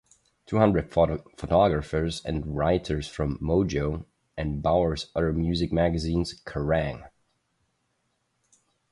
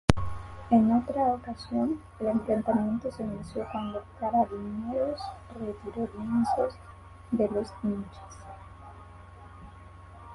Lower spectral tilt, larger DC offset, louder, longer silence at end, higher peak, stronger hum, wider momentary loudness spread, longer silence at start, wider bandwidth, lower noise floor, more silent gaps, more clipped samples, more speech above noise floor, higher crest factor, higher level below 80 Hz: about the same, -7 dB/octave vs -7.5 dB/octave; neither; first, -26 LUFS vs -30 LUFS; first, 1.85 s vs 0 s; second, -6 dBFS vs 0 dBFS; neither; second, 10 LU vs 23 LU; first, 0.5 s vs 0.1 s; about the same, 11.5 kHz vs 11.5 kHz; first, -74 dBFS vs -48 dBFS; neither; neither; first, 49 dB vs 19 dB; second, 20 dB vs 30 dB; first, -40 dBFS vs -46 dBFS